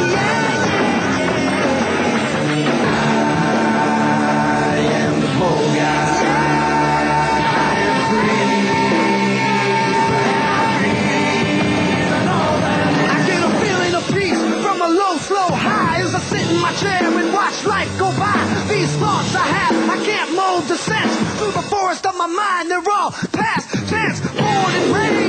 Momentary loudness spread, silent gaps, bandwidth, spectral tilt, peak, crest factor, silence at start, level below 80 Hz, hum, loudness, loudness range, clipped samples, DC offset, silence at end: 3 LU; none; 11 kHz; -5 dB/octave; -4 dBFS; 12 dB; 0 s; -46 dBFS; none; -16 LUFS; 2 LU; under 0.1%; under 0.1%; 0 s